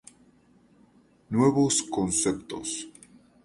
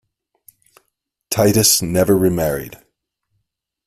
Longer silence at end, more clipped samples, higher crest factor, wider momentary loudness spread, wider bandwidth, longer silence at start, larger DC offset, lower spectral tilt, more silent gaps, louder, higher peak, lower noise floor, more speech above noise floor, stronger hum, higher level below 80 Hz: second, 0.55 s vs 1.1 s; neither; about the same, 20 dB vs 20 dB; about the same, 12 LU vs 12 LU; second, 11.5 kHz vs 16 kHz; about the same, 1.3 s vs 1.3 s; neither; about the same, -4.5 dB/octave vs -4 dB/octave; neither; second, -26 LUFS vs -15 LUFS; second, -8 dBFS vs 0 dBFS; second, -60 dBFS vs -74 dBFS; second, 35 dB vs 58 dB; neither; second, -58 dBFS vs -46 dBFS